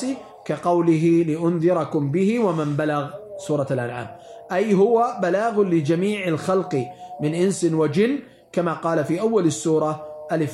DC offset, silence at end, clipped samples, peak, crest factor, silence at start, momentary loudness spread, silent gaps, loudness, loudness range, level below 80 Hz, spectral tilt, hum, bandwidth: under 0.1%; 0 s; under 0.1%; -8 dBFS; 14 dB; 0 s; 11 LU; none; -21 LUFS; 2 LU; -66 dBFS; -6.5 dB/octave; none; 12 kHz